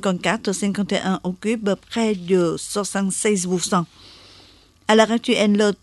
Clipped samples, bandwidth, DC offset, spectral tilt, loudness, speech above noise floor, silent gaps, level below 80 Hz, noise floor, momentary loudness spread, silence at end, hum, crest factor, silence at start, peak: under 0.1%; 12 kHz; under 0.1%; -4.5 dB/octave; -20 LUFS; 31 dB; none; -56 dBFS; -51 dBFS; 8 LU; 0.05 s; none; 18 dB; 0 s; -2 dBFS